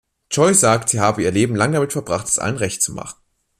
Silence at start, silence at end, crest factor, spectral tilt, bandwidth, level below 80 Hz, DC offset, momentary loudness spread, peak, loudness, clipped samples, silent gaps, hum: 0.3 s; 0.5 s; 18 dB; -4 dB/octave; 15 kHz; -52 dBFS; under 0.1%; 9 LU; 0 dBFS; -17 LUFS; under 0.1%; none; none